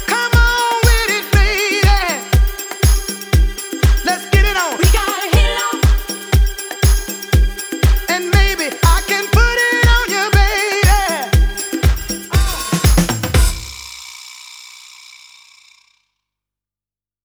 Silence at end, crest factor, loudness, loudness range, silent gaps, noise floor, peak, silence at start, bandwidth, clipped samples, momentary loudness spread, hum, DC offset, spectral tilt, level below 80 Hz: 2.6 s; 14 dB; -15 LUFS; 5 LU; none; under -90 dBFS; -2 dBFS; 0 s; over 20 kHz; under 0.1%; 7 LU; 50 Hz at -25 dBFS; under 0.1%; -4 dB/octave; -18 dBFS